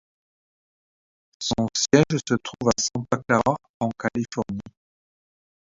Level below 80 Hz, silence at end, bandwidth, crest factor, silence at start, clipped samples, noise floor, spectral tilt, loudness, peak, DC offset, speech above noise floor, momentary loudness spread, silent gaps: -54 dBFS; 1 s; 7.8 kHz; 24 dB; 1.4 s; under 0.1%; under -90 dBFS; -4.5 dB/octave; -24 LUFS; -2 dBFS; under 0.1%; over 67 dB; 11 LU; 3.69-3.80 s